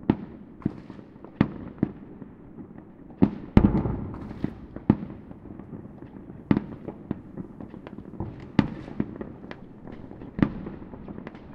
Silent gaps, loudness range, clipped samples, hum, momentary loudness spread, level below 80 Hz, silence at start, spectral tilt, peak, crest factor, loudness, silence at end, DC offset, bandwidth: none; 7 LU; under 0.1%; none; 18 LU; -42 dBFS; 0 s; -10 dB/octave; 0 dBFS; 30 dB; -29 LUFS; 0 s; under 0.1%; 5.8 kHz